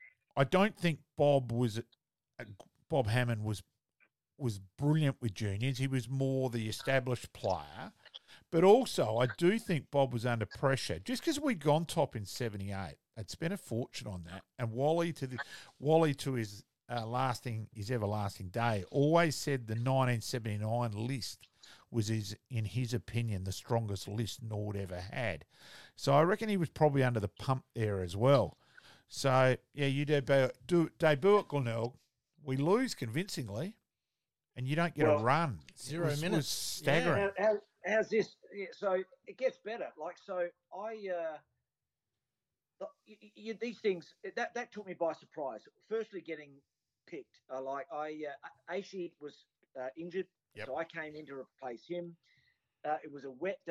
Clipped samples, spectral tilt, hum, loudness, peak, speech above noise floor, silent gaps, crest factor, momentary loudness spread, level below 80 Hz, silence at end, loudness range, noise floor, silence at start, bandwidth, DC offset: under 0.1%; -6 dB/octave; none; -34 LUFS; -12 dBFS; over 56 dB; none; 22 dB; 17 LU; -66 dBFS; 0 s; 12 LU; under -90 dBFS; 0 s; 14.5 kHz; under 0.1%